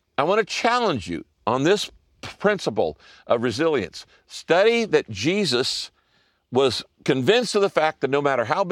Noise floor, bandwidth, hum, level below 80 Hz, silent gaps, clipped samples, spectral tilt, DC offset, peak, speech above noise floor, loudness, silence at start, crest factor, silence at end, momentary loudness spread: -65 dBFS; 15 kHz; none; -60 dBFS; none; under 0.1%; -4.5 dB/octave; under 0.1%; -4 dBFS; 43 dB; -22 LUFS; 0.2 s; 18 dB; 0 s; 13 LU